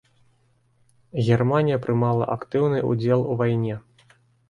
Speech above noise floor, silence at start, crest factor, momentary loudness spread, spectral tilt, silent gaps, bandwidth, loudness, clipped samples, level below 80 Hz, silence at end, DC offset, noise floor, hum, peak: 42 dB; 1.15 s; 18 dB; 7 LU; -9 dB/octave; none; 7.2 kHz; -23 LUFS; under 0.1%; -58 dBFS; 0.7 s; under 0.1%; -63 dBFS; none; -6 dBFS